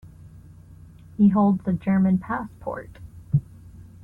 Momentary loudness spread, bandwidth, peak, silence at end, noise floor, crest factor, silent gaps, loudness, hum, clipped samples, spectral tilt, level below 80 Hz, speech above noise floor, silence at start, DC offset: 20 LU; 3.4 kHz; -8 dBFS; 0.2 s; -46 dBFS; 16 dB; none; -23 LUFS; none; under 0.1%; -11 dB/octave; -50 dBFS; 25 dB; 0.05 s; under 0.1%